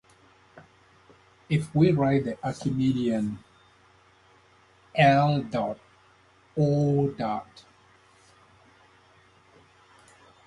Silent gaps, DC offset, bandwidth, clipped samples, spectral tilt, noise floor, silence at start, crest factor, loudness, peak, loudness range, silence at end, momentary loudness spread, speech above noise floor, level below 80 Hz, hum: none; under 0.1%; 11.5 kHz; under 0.1%; -7.5 dB/octave; -59 dBFS; 0.55 s; 22 dB; -25 LUFS; -6 dBFS; 5 LU; 3.05 s; 13 LU; 35 dB; -58 dBFS; none